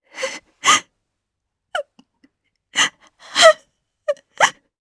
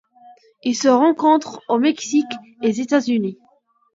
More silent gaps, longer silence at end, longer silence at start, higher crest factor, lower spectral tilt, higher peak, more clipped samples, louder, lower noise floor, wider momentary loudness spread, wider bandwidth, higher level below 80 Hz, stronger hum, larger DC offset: neither; second, 0.3 s vs 0.6 s; second, 0.15 s vs 0.65 s; about the same, 20 dB vs 16 dB; second, 0.5 dB/octave vs -4.5 dB/octave; about the same, 0 dBFS vs -2 dBFS; neither; about the same, -18 LUFS vs -19 LUFS; first, -79 dBFS vs -49 dBFS; first, 17 LU vs 10 LU; first, 11 kHz vs 7.8 kHz; first, -64 dBFS vs -72 dBFS; neither; neither